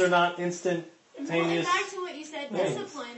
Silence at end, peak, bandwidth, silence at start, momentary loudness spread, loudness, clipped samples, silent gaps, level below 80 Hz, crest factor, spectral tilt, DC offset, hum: 0 s; -10 dBFS; 8.6 kHz; 0 s; 12 LU; -29 LUFS; under 0.1%; none; -74 dBFS; 18 dB; -4.5 dB/octave; under 0.1%; none